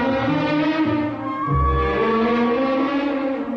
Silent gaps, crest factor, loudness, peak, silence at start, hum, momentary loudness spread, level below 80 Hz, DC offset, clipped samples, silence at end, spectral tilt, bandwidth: none; 12 dB; -20 LUFS; -8 dBFS; 0 s; none; 5 LU; -32 dBFS; under 0.1%; under 0.1%; 0 s; -8 dB/octave; 6.8 kHz